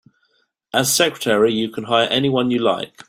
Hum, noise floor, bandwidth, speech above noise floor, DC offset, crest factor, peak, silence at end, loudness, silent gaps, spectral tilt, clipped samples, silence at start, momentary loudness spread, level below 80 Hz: none; -65 dBFS; 16 kHz; 47 dB; under 0.1%; 18 dB; -2 dBFS; 0.2 s; -18 LUFS; none; -3.5 dB/octave; under 0.1%; 0.75 s; 4 LU; -60 dBFS